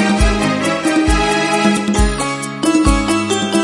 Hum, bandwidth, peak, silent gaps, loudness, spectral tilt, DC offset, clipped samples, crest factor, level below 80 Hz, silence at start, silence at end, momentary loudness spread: none; 11.5 kHz; 0 dBFS; none; -15 LUFS; -4.5 dB/octave; under 0.1%; under 0.1%; 14 dB; -22 dBFS; 0 s; 0 s; 3 LU